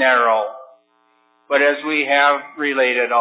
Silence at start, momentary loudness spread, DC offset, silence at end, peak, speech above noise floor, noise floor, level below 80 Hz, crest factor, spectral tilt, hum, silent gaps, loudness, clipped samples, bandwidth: 0 s; 7 LU; under 0.1%; 0 s; -2 dBFS; 43 dB; -60 dBFS; under -90 dBFS; 16 dB; -5.5 dB/octave; none; none; -17 LUFS; under 0.1%; 4 kHz